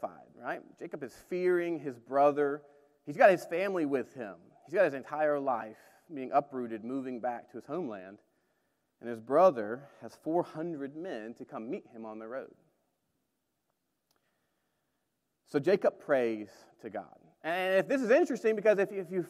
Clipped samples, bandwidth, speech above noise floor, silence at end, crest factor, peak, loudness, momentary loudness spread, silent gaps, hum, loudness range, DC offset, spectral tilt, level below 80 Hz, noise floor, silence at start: under 0.1%; 14 kHz; 51 dB; 0 s; 24 dB; -8 dBFS; -31 LUFS; 18 LU; none; none; 14 LU; under 0.1%; -6.5 dB/octave; -84 dBFS; -82 dBFS; 0 s